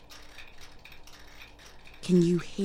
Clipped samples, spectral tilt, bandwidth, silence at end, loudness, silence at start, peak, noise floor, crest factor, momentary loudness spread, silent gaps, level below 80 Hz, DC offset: under 0.1%; -7 dB/octave; 14 kHz; 0 s; -26 LUFS; 0.1 s; -14 dBFS; -49 dBFS; 18 dB; 26 LU; none; -52 dBFS; under 0.1%